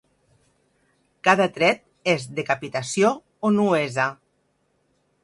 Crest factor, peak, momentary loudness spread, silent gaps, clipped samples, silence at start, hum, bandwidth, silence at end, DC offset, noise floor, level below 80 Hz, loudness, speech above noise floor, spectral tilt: 24 dB; -2 dBFS; 7 LU; none; under 0.1%; 1.25 s; none; 11.5 kHz; 1.1 s; under 0.1%; -69 dBFS; -68 dBFS; -22 LUFS; 47 dB; -4.5 dB/octave